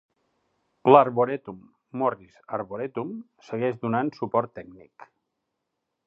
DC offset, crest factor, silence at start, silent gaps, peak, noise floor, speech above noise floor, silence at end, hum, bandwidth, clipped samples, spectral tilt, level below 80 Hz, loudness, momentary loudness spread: under 0.1%; 26 dB; 0.85 s; none; -2 dBFS; -81 dBFS; 56 dB; 1 s; none; 6.8 kHz; under 0.1%; -8.5 dB/octave; -70 dBFS; -25 LUFS; 22 LU